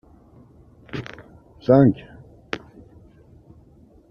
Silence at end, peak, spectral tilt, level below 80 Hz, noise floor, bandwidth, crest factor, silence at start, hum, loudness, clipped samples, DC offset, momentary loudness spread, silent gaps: 1.55 s; -2 dBFS; -9 dB/octave; -52 dBFS; -52 dBFS; 6.6 kHz; 22 dB; 0.95 s; none; -21 LUFS; under 0.1%; under 0.1%; 22 LU; none